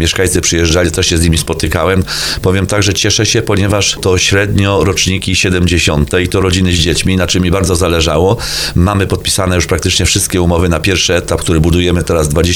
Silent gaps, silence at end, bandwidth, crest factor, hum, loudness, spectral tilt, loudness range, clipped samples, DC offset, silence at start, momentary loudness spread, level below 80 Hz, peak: none; 0 s; 19 kHz; 10 dB; none; -11 LUFS; -4 dB/octave; 1 LU; under 0.1%; under 0.1%; 0 s; 3 LU; -24 dBFS; 0 dBFS